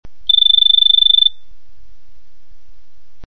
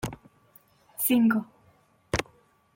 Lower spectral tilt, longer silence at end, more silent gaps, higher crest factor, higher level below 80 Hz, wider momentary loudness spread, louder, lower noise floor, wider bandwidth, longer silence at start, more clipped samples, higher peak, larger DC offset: second, -2 dB/octave vs -4.5 dB/octave; second, 0 s vs 0.55 s; neither; second, 14 dB vs 20 dB; first, -46 dBFS vs -52 dBFS; second, 5 LU vs 21 LU; first, -9 LUFS vs -26 LUFS; second, -50 dBFS vs -63 dBFS; second, 4.8 kHz vs 17 kHz; first, 0.3 s vs 0.05 s; neither; first, 0 dBFS vs -10 dBFS; first, 6% vs under 0.1%